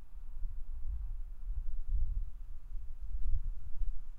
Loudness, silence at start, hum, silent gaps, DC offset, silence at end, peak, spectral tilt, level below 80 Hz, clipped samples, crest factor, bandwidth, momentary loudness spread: -45 LUFS; 0 s; none; none; under 0.1%; 0 s; -18 dBFS; -8 dB/octave; -36 dBFS; under 0.1%; 14 dB; 1 kHz; 10 LU